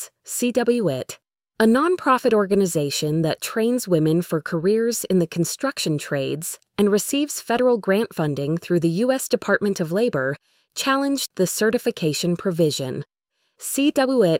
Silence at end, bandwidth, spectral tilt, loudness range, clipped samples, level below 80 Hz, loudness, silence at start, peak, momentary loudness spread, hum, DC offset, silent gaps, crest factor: 0 s; 16.5 kHz; -5 dB/octave; 2 LU; under 0.1%; -62 dBFS; -21 LUFS; 0 s; -6 dBFS; 8 LU; none; under 0.1%; none; 16 dB